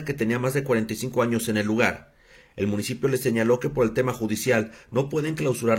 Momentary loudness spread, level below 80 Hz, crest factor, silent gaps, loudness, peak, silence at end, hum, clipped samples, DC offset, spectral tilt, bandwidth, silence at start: 5 LU; -54 dBFS; 18 dB; none; -25 LUFS; -6 dBFS; 0 s; none; under 0.1%; under 0.1%; -5.5 dB/octave; 16.5 kHz; 0 s